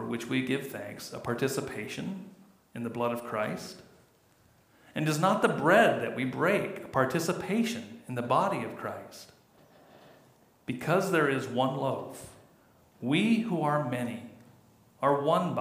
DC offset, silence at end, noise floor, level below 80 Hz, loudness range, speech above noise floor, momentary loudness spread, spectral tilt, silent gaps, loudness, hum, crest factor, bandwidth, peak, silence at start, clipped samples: under 0.1%; 0 s; -64 dBFS; -70 dBFS; 8 LU; 35 dB; 18 LU; -5.5 dB/octave; none; -29 LUFS; none; 22 dB; 15.5 kHz; -10 dBFS; 0 s; under 0.1%